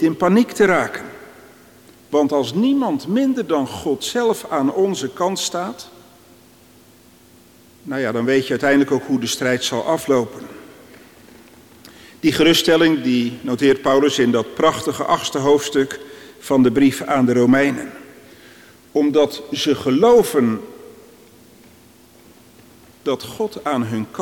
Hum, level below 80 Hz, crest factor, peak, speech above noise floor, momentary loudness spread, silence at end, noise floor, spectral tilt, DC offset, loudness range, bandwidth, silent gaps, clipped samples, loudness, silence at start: none; -56 dBFS; 16 dB; -4 dBFS; 31 dB; 13 LU; 0 s; -49 dBFS; -4.5 dB/octave; under 0.1%; 8 LU; 18 kHz; none; under 0.1%; -18 LUFS; 0 s